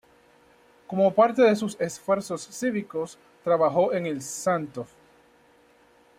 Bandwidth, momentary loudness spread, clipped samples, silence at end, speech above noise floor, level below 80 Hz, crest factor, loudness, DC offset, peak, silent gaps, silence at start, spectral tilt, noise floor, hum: 15.5 kHz; 14 LU; under 0.1%; 1.35 s; 34 dB; -70 dBFS; 18 dB; -25 LUFS; under 0.1%; -8 dBFS; none; 0.9 s; -5.5 dB/octave; -59 dBFS; none